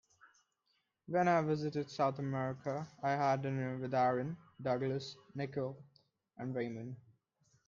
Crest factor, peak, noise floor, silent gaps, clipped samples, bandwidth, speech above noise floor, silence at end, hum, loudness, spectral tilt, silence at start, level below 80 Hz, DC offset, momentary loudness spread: 18 dB; -20 dBFS; -81 dBFS; none; under 0.1%; 7.4 kHz; 45 dB; 0.65 s; none; -37 LUFS; -7 dB/octave; 1.1 s; -78 dBFS; under 0.1%; 12 LU